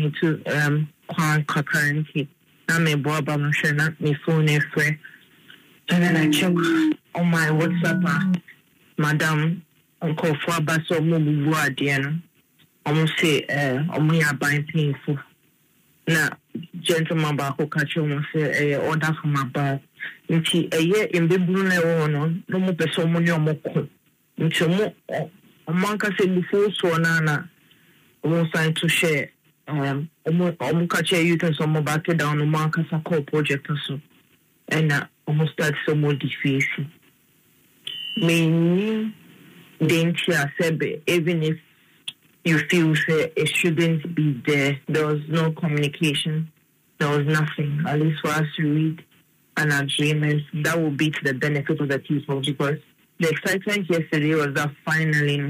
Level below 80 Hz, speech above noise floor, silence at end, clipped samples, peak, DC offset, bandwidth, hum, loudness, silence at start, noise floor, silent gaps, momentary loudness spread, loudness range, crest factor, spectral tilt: -66 dBFS; 40 dB; 0 s; under 0.1%; -8 dBFS; under 0.1%; 15.5 kHz; none; -22 LUFS; 0 s; -61 dBFS; none; 9 LU; 3 LU; 16 dB; -5.5 dB/octave